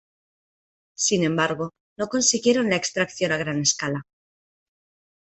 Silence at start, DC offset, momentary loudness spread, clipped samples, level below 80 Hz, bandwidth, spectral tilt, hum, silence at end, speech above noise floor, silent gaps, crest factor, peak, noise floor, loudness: 1 s; under 0.1%; 11 LU; under 0.1%; -62 dBFS; 8.6 kHz; -3 dB/octave; none; 1.2 s; over 67 dB; 1.80-1.96 s; 22 dB; -4 dBFS; under -90 dBFS; -22 LUFS